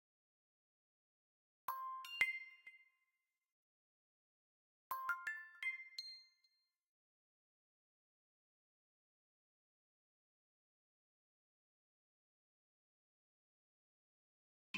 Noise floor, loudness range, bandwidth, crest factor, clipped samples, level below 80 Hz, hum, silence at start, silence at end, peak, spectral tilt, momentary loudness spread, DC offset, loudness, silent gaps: under -90 dBFS; 6 LU; 16 kHz; 34 dB; under 0.1%; under -90 dBFS; none; 1.7 s; 0 s; -20 dBFS; 0 dB/octave; 18 LU; under 0.1%; -44 LUFS; 3.52-4.90 s, 6.87-14.74 s